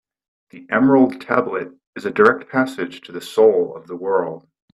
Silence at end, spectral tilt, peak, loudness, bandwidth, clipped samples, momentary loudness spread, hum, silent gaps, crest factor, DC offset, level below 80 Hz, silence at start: 0.35 s; -6.5 dB/octave; 0 dBFS; -18 LUFS; 13 kHz; under 0.1%; 14 LU; none; 1.87-1.93 s; 18 dB; under 0.1%; -64 dBFS; 0.55 s